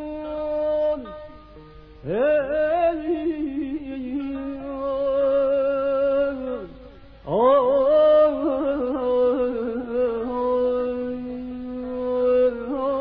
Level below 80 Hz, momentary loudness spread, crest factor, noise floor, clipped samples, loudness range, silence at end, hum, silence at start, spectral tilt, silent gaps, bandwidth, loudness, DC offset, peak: -48 dBFS; 13 LU; 14 dB; -44 dBFS; under 0.1%; 5 LU; 0 s; none; 0 s; -9.5 dB/octave; none; 5.2 kHz; -23 LUFS; under 0.1%; -8 dBFS